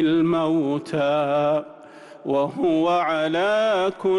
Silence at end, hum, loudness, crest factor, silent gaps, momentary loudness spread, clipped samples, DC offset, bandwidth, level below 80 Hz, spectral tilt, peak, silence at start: 0 s; none; -21 LUFS; 10 dB; none; 5 LU; under 0.1%; under 0.1%; 11 kHz; -62 dBFS; -6.5 dB/octave; -12 dBFS; 0 s